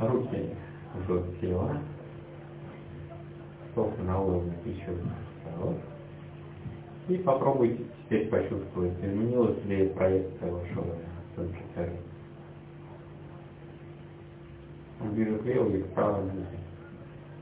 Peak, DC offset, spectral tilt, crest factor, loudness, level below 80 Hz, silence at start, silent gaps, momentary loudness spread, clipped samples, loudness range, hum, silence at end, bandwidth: -12 dBFS; under 0.1%; -8.5 dB/octave; 20 dB; -31 LUFS; -48 dBFS; 0 s; none; 19 LU; under 0.1%; 11 LU; none; 0 s; 4 kHz